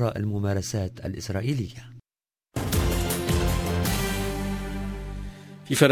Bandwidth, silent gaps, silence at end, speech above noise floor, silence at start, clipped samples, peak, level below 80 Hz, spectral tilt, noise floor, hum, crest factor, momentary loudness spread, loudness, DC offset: 16 kHz; none; 0 s; over 62 dB; 0 s; under 0.1%; -4 dBFS; -34 dBFS; -5 dB/octave; under -90 dBFS; none; 22 dB; 12 LU; -28 LUFS; under 0.1%